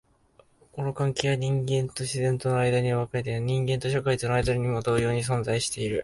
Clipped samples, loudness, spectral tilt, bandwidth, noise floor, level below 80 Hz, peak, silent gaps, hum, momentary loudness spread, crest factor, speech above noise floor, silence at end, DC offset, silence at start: under 0.1%; -26 LUFS; -5.5 dB/octave; 11.5 kHz; -61 dBFS; -50 dBFS; -8 dBFS; none; none; 4 LU; 18 dB; 35 dB; 0 s; under 0.1%; 0.75 s